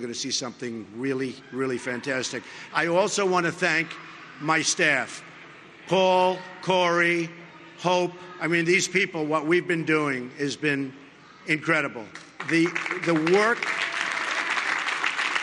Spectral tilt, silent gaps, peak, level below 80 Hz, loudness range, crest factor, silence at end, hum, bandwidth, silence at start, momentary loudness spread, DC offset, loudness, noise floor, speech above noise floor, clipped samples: -3.5 dB/octave; none; -6 dBFS; -72 dBFS; 3 LU; 20 dB; 0 s; none; 11.5 kHz; 0 s; 14 LU; under 0.1%; -24 LUFS; -46 dBFS; 22 dB; under 0.1%